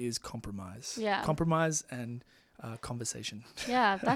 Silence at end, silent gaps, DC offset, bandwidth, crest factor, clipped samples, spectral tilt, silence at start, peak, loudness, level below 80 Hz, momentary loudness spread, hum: 0 s; none; under 0.1%; 15.5 kHz; 18 dB; under 0.1%; -4 dB/octave; 0 s; -14 dBFS; -33 LUFS; -58 dBFS; 15 LU; none